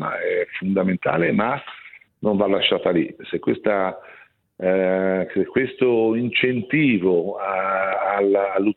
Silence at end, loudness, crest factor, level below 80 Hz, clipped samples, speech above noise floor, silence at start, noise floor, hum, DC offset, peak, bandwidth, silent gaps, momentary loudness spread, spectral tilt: 0.05 s; -21 LUFS; 16 dB; -60 dBFS; under 0.1%; 24 dB; 0 s; -44 dBFS; none; under 0.1%; -4 dBFS; 4.3 kHz; none; 8 LU; -9.5 dB/octave